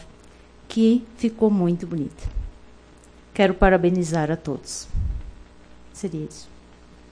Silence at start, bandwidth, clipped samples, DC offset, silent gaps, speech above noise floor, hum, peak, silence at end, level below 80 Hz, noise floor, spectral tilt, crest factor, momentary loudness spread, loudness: 0 s; 10.5 kHz; under 0.1%; under 0.1%; none; 27 dB; 60 Hz at -45 dBFS; -2 dBFS; 0.65 s; -34 dBFS; -49 dBFS; -6.5 dB/octave; 22 dB; 19 LU; -23 LUFS